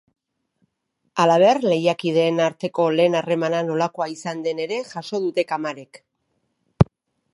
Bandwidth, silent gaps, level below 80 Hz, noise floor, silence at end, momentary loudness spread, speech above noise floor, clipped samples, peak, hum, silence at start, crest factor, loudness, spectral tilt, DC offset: 11.5 kHz; none; -46 dBFS; -73 dBFS; 0.5 s; 11 LU; 53 dB; under 0.1%; 0 dBFS; none; 1.15 s; 22 dB; -21 LUFS; -6 dB/octave; under 0.1%